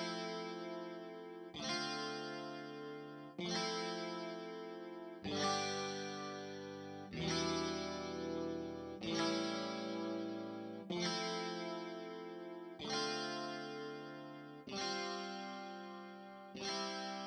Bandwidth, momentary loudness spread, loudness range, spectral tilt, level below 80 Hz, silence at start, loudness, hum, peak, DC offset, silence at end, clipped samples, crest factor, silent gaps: 9.6 kHz; 12 LU; 4 LU; -4 dB/octave; -74 dBFS; 0 s; -43 LUFS; none; -24 dBFS; under 0.1%; 0 s; under 0.1%; 18 dB; none